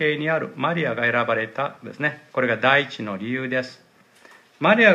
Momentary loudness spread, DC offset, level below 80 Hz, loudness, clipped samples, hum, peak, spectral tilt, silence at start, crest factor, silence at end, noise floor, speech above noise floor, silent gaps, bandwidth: 11 LU; under 0.1%; -74 dBFS; -22 LUFS; under 0.1%; none; -2 dBFS; -6 dB/octave; 0 s; 20 dB; 0 s; -52 dBFS; 31 dB; none; 9.4 kHz